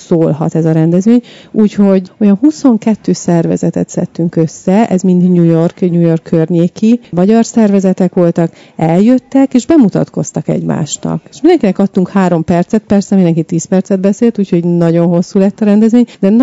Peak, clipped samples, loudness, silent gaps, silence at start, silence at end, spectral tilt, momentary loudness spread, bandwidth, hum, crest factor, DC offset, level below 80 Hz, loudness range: 0 dBFS; 2%; -10 LUFS; none; 0 s; 0 s; -7.5 dB/octave; 6 LU; 8 kHz; none; 10 dB; 0.1%; -48 dBFS; 2 LU